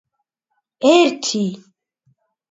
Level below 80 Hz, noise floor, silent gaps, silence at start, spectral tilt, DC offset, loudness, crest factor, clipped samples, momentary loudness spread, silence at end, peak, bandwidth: -72 dBFS; -74 dBFS; none; 0.8 s; -4 dB/octave; under 0.1%; -16 LUFS; 18 dB; under 0.1%; 10 LU; 0.95 s; -2 dBFS; 7.8 kHz